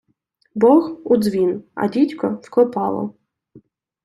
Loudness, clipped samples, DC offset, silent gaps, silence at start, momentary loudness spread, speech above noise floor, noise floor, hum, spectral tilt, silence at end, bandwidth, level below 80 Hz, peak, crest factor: -18 LUFS; under 0.1%; under 0.1%; none; 0.55 s; 11 LU; 48 dB; -66 dBFS; none; -7.5 dB/octave; 0.45 s; 13 kHz; -62 dBFS; -2 dBFS; 18 dB